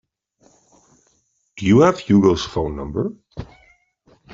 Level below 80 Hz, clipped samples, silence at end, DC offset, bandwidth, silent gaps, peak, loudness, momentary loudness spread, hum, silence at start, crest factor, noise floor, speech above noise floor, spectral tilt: -44 dBFS; under 0.1%; 0.9 s; under 0.1%; 7.6 kHz; none; -2 dBFS; -18 LUFS; 23 LU; none; 1.55 s; 18 dB; -65 dBFS; 48 dB; -7 dB/octave